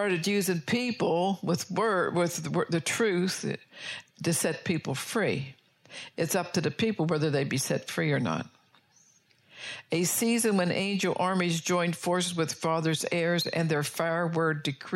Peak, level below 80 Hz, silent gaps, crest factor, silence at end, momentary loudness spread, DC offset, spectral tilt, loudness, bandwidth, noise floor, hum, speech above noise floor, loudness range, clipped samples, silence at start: -14 dBFS; -72 dBFS; none; 16 dB; 0 s; 9 LU; under 0.1%; -4.5 dB/octave; -28 LUFS; 16 kHz; -63 dBFS; none; 35 dB; 3 LU; under 0.1%; 0 s